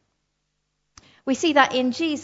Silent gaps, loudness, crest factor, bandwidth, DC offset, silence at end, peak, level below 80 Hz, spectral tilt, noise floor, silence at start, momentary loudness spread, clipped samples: none; -20 LUFS; 22 dB; 8 kHz; under 0.1%; 0 s; -2 dBFS; -66 dBFS; -2.5 dB/octave; -75 dBFS; 1.25 s; 10 LU; under 0.1%